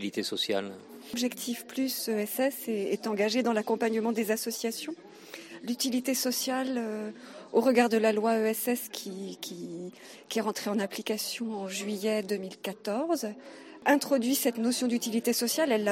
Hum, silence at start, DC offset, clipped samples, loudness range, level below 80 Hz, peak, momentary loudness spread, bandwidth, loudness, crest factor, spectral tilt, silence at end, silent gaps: none; 0 s; under 0.1%; under 0.1%; 5 LU; -84 dBFS; -8 dBFS; 14 LU; 16.5 kHz; -30 LUFS; 22 dB; -3.5 dB/octave; 0 s; none